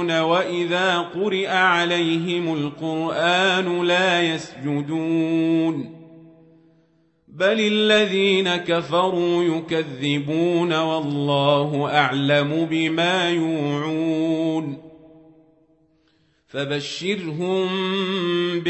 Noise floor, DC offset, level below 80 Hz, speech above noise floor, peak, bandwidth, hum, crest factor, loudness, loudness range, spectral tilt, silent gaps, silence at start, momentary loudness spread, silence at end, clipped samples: -63 dBFS; under 0.1%; -66 dBFS; 42 dB; -4 dBFS; 8.4 kHz; none; 18 dB; -21 LUFS; 7 LU; -5.5 dB/octave; none; 0 s; 8 LU; 0 s; under 0.1%